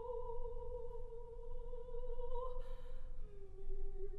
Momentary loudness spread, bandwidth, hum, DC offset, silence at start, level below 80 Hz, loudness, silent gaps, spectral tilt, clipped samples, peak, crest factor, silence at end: 9 LU; 3.1 kHz; none; under 0.1%; 0 s; -44 dBFS; -51 LUFS; none; -8.5 dB/octave; under 0.1%; -28 dBFS; 12 dB; 0 s